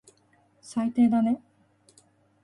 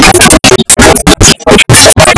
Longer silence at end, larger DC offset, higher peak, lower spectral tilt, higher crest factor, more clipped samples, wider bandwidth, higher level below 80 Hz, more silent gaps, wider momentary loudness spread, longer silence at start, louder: first, 1.05 s vs 0 s; neither; second, -12 dBFS vs 0 dBFS; first, -7 dB/octave vs -3 dB/octave; first, 16 dB vs 2 dB; second, under 0.1% vs 50%; about the same, 11 kHz vs 11 kHz; second, -68 dBFS vs -16 dBFS; neither; first, 11 LU vs 3 LU; first, 0.65 s vs 0 s; second, -25 LUFS vs -1 LUFS